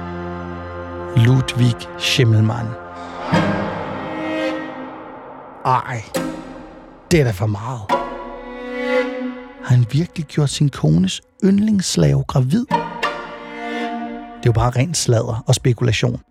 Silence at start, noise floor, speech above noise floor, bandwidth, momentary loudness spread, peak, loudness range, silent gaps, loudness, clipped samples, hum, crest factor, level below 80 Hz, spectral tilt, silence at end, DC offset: 0 s; -39 dBFS; 23 dB; 13.5 kHz; 15 LU; -2 dBFS; 5 LU; none; -19 LUFS; under 0.1%; none; 16 dB; -42 dBFS; -5.5 dB/octave; 0.1 s; under 0.1%